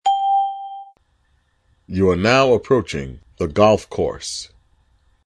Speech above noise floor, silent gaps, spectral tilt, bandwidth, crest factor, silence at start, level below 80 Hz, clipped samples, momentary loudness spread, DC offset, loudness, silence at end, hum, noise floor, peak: 45 dB; none; -5.5 dB/octave; 11 kHz; 20 dB; 0.05 s; -44 dBFS; under 0.1%; 18 LU; under 0.1%; -18 LUFS; 0.8 s; none; -62 dBFS; 0 dBFS